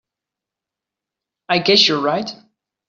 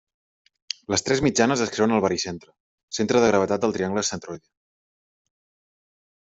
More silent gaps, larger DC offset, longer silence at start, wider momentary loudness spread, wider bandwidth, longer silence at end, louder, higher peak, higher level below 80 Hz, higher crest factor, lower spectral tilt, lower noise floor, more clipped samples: second, none vs 2.60-2.88 s; neither; first, 1.5 s vs 0.9 s; second, 12 LU vs 15 LU; about the same, 7.6 kHz vs 8.2 kHz; second, 0.55 s vs 1.95 s; first, -15 LUFS vs -22 LUFS; about the same, -2 dBFS vs -4 dBFS; second, -62 dBFS vs -56 dBFS; about the same, 20 dB vs 22 dB; second, -1.5 dB/octave vs -4 dB/octave; second, -86 dBFS vs under -90 dBFS; neither